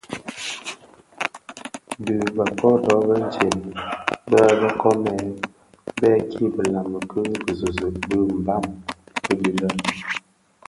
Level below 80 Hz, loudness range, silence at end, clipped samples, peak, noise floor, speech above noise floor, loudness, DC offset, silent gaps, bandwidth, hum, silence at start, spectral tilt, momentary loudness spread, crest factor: -48 dBFS; 5 LU; 0.5 s; under 0.1%; 0 dBFS; -49 dBFS; 28 dB; -22 LUFS; under 0.1%; none; 11.5 kHz; none; 0.1 s; -5.5 dB/octave; 15 LU; 22 dB